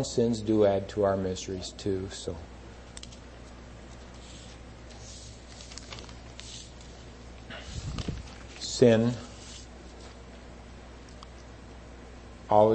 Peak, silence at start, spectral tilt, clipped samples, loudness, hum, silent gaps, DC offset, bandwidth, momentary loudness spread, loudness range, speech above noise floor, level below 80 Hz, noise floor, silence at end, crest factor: -6 dBFS; 0 s; -5.5 dB/octave; under 0.1%; -28 LUFS; 60 Hz at -50 dBFS; none; under 0.1%; 8.8 kHz; 23 LU; 15 LU; 20 dB; -48 dBFS; -46 dBFS; 0 s; 24 dB